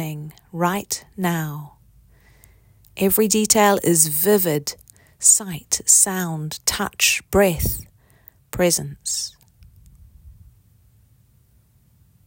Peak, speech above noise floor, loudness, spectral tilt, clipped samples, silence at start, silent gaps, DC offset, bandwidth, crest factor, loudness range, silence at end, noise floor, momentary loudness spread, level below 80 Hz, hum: 0 dBFS; 37 dB; -18 LUFS; -3 dB/octave; under 0.1%; 0 s; none; under 0.1%; 17 kHz; 22 dB; 10 LU; 1.95 s; -57 dBFS; 17 LU; -44 dBFS; none